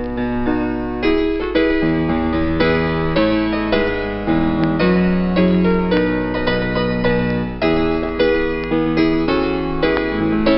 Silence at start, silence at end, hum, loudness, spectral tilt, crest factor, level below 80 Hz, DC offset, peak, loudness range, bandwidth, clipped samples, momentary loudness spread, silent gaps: 0 s; 0 s; none; -17 LUFS; -5.5 dB/octave; 12 dB; -30 dBFS; 0.2%; -4 dBFS; 1 LU; 5.8 kHz; under 0.1%; 4 LU; none